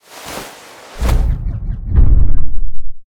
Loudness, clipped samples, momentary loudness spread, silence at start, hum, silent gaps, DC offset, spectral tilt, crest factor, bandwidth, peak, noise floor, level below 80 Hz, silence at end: -19 LUFS; under 0.1%; 18 LU; 0.25 s; none; none; under 0.1%; -6 dB/octave; 10 dB; 12 kHz; 0 dBFS; -36 dBFS; -14 dBFS; 0.05 s